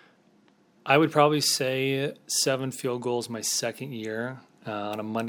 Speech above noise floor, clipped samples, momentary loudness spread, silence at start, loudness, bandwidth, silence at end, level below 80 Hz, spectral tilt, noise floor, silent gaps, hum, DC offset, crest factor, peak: 35 dB; under 0.1%; 14 LU; 0.85 s; -26 LUFS; over 20 kHz; 0 s; -76 dBFS; -3.5 dB/octave; -61 dBFS; none; none; under 0.1%; 22 dB; -6 dBFS